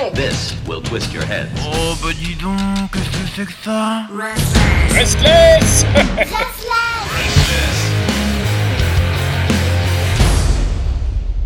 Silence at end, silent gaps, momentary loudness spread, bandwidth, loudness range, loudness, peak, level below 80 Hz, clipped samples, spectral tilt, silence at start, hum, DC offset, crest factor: 0 s; none; 11 LU; 17.5 kHz; 8 LU; -15 LUFS; 0 dBFS; -22 dBFS; under 0.1%; -4.5 dB/octave; 0 s; none; under 0.1%; 14 dB